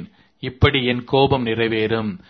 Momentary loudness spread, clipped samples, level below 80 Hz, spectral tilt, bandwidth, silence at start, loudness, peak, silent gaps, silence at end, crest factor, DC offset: 8 LU; under 0.1%; -38 dBFS; -8.5 dB/octave; 6.2 kHz; 0 s; -19 LUFS; -2 dBFS; none; 0.1 s; 18 dB; under 0.1%